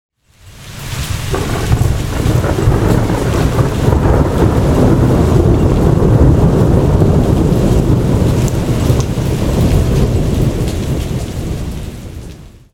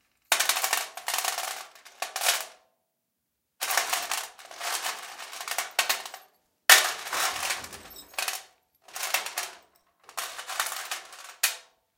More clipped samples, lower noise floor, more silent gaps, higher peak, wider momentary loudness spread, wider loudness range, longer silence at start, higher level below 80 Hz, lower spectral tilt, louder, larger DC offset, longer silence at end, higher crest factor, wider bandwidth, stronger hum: neither; second, -40 dBFS vs -80 dBFS; neither; about the same, 0 dBFS vs 0 dBFS; second, 11 LU vs 16 LU; second, 5 LU vs 8 LU; first, 0.45 s vs 0.3 s; first, -20 dBFS vs -74 dBFS; first, -7 dB/octave vs 3 dB/octave; first, -13 LUFS vs -27 LUFS; neither; about the same, 0.25 s vs 0.35 s; second, 12 dB vs 30 dB; about the same, 16.5 kHz vs 17 kHz; neither